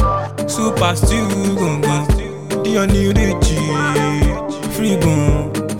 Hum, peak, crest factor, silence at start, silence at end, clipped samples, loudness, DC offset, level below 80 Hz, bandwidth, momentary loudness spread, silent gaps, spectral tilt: none; 0 dBFS; 14 dB; 0 s; 0 s; under 0.1%; -17 LUFS; 0.8%; -24 dBFS; 17 kHz; 6 LU; none; -5.5 dB/octave